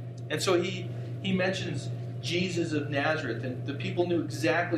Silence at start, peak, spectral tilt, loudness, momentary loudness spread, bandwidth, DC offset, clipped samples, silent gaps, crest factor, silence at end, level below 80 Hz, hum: 0 s; -12 dBFS; -5.5 dB/octave; -30 LUFS; 8 LU; 14 kHz; under 0.1%; under 0.1%; none; 18 dB; 0 s; -66 dBFS; none